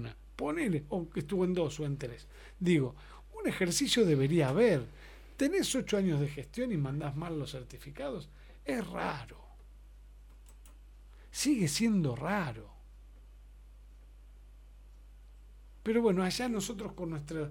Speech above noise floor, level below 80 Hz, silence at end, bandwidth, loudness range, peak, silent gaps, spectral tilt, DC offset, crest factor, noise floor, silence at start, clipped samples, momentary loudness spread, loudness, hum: 21 dB; -54 dBFS; 0 s; 17.5 kHz; 12 LU; -16 dBFS; none; -5 dB/octave; under 0.1%; 18 dB; -53 dBFS; 0 s; under 0.1%; 17 LU; -32 LUFS; 50 Hz at -55 dBFS